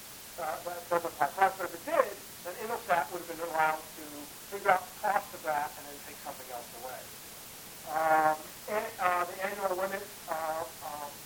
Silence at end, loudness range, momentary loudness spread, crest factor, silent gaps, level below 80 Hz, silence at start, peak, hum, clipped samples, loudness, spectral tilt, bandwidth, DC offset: 0 s; 3 LU; 15 LU; 26 dB; none; -68 dBFS; 0 s; -8 dBFS; none; under 0.1%; -33 LUFS; -2.5 dB/octave; over 20 kHz; under 0.1%